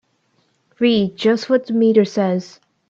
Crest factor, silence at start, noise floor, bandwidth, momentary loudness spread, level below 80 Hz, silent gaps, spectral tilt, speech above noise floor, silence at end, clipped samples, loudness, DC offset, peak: 16 dB; 0.8 s; -63 dBFS; 7.4 kHz; 5 LU; -64 dBFS; none; -6.5 dB/octave; 47 dB; 0.4 s; under 0.1%; -17 LUFS; under 0.1%; -2 dBFS